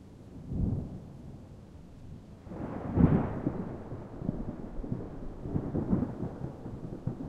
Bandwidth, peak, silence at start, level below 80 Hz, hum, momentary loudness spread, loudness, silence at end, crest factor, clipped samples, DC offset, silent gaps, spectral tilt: 7.6 kHz; -8 dBFS; 0 s; -44 dBFS; none; 21 LU; -34 LUFS; 0 s; 26 dB; under 0.1%; under 0.1%; none; -10.5 dB/octave